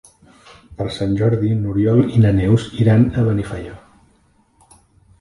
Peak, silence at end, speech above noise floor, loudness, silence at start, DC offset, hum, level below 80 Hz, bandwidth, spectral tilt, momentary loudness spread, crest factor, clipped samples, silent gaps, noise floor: -2 dBFS; 1.4 s; 41 dB; -17 LUFS; 0.7 s; under 0.1%; none; -38 dBFS; 11 kHz; -8.5 dB/octave; 14 LU; 16 dB; under 0.1%; none; -57 dBFS